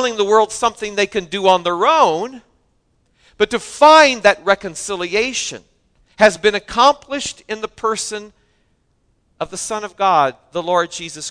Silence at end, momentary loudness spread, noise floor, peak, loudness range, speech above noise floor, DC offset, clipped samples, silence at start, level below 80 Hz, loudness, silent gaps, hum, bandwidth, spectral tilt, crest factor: 0 s; 14 LU; -62 dBFS; 0 dBFS; 7 LU; 46 dB; under 0.1%; under 0.1%; 0 s; -52 dBFS; -16 LUFS; none; none; 11 kHz; -2.5 dB/octave; 18 dB